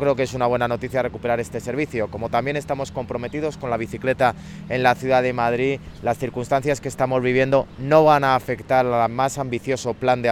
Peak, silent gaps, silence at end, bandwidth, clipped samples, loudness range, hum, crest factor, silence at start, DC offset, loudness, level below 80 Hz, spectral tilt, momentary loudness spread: -2 dBFS; none; 0 s; 16 kHz; under 0.1%; 5 LU; none; 18 dB; 0 s; under 0.1%; -21 LUFS; -46 dBFS; -6 dB/octave; 9 LU